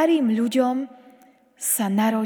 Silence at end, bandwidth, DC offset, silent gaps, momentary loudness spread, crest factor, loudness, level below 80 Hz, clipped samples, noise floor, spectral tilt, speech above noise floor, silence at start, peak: 0 s; over 20 kHz; under 0.1%; none; 9 LU; 14 dB; -22 LUFS; -80 dBFS; under 0.1%; -54 dBFS; -4.5 dB/octave; 33 dB; 0 s; -8 dBFS